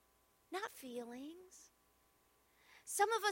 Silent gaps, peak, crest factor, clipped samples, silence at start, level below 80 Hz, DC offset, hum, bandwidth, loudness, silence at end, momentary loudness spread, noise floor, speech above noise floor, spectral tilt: none; -22 dBFS; 22 dB; under 0.1%; 0.5 s; -84 dBFS; under 0.1%; none; 16.5 kHz; -42 LUFS; 0 s; 23 LU; -75 dBFS; 35 dB; -0.5 dB/octave